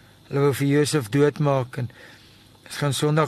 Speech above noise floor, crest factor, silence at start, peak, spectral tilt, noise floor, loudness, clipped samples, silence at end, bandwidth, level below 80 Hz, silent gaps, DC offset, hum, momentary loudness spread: 28 dB; 16 dB; 0.3 s; -6 dBFS; -6 dB/octave; -50 dBFS; -22 LUFS; under 0.1%; 0 s; 13 kHz; -60 dBFS; none; under 0.1%; none; 12 LU